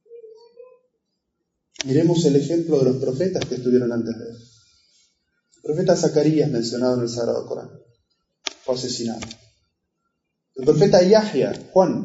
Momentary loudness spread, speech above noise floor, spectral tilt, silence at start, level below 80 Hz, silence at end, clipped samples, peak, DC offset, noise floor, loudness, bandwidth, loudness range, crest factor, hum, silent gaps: 16 LU; 57 dB; -6 dB/octave; 0.1 s; -58 dBFS; 0 s; under 0.1%; -4 dBFS; under 0.1%; -77 dBFS; -20 LUFS; 8 kHz; 6 LU; 18 dB; none; none